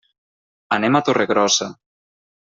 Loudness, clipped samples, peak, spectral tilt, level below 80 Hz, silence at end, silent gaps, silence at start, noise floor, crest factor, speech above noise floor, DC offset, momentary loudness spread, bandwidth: -18 LUFS; under 0.1%; -4 dBFS; -3 dB/octave; -64 dBFS; 0.7 s; none; 0.7 s; under -90 dBFS; 18 dB; over 72 dB; under 0.1%; 7 LU; 7.8 kHz